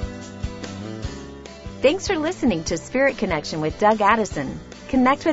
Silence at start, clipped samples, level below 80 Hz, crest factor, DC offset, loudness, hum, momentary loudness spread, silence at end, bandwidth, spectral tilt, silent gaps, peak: 0 s; under 0.1%; -40 dBFS; 20 dB; under 0.1%; -22 LUFS; none; 16 LU; 0 s; 8 kHz; -5 dB/octave; none; -2 dBFS